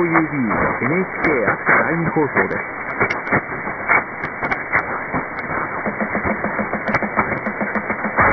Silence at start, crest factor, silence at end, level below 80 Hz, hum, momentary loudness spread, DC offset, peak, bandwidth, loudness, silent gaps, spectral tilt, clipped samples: 0 s; 18 dB; 0 s; -46 dBFS; none; 7 LU; under 0.1%; -2 dBFS; 6.2 kHz; -19 LUFS; none; -8.5 dB/octave; under 0.1%